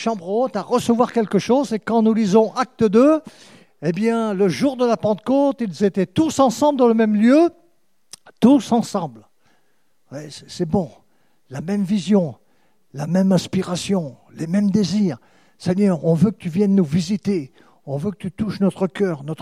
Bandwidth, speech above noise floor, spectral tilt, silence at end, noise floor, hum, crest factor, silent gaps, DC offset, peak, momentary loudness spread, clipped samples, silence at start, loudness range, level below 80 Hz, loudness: 13 kHz; 49 dB; -7 dB/octave; 0 s; -67 dBFS; none; 18 dB; none; 0.1%; -2 dBFS; 13 LU; under 0.1%; 0 s; 6 LU; -56 dBFS; -19 LUFS